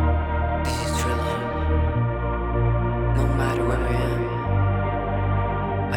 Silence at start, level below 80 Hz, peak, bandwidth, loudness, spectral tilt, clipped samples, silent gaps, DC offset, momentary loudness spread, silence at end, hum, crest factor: 0 s; -28 dBFS; -10 dBFS; 17.5 kHz; -24 LUFS; -7 dB/octave; under 0.1%; none; under 0.1%; 3 LU; 0 s; none; 12 dB